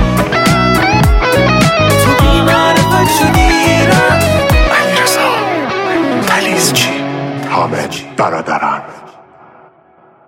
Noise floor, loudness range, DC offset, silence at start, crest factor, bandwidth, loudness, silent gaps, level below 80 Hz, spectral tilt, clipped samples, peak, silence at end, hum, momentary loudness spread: -45 dBFS; 6 LU; under 0.1%; 0 s; 12 dB; 17 kHz; -10 LUFS; none; -22 dBFS; -4.5 dB/octave; under 0.1%; 0 dBFS; 1.15 s; none; 7 LU